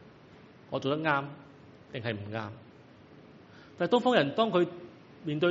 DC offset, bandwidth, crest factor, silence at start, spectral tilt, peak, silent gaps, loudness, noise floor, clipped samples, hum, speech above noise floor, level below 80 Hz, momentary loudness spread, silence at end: under 0.1%; 7.6 kHz; 24 dB; 0 s; -4 dB/octave; -8 dBFS; none; -30 LUFS; -54 dBFS; under 0.1%; none; 25 dB; -72 dBFS; 20 LU; 0 s